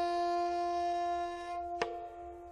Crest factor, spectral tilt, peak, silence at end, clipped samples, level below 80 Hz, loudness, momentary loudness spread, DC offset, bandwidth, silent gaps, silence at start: 20 dB; -4.5 dB/octave; -16 dBFS; 0 s; under 0.1%; -62 dBFS; -36 LUFS; 11 LU; under 0.1%; 10.5 kHz; none; 0 s